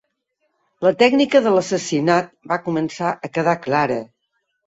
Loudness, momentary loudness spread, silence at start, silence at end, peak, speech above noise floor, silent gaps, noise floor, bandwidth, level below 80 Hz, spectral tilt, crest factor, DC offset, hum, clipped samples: -19 LUFS; 9 LU; 0.8 s; 0.65 s; -2 dBFS; 54 dB; none; -72 dBFS; 8 kHz; -62 dBFS; -5 dB/octave; 18 dB; under 0.1%; none; under 0.1%